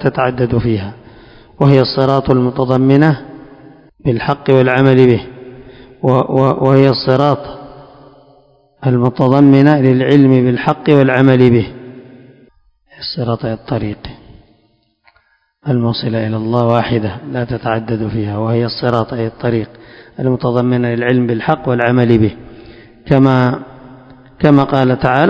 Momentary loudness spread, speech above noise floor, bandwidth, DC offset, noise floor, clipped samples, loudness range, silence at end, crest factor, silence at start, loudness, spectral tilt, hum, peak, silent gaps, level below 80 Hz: 12 LU; 45 dB; 6.4 kHz; under 0.1%; -57 dBFS; 0.6%; 8 LU; 0 s; 14 dB; 0 s; -13 LUFS; -9.5 dB/octave; none; 0 dBFS; none; -42 dBFS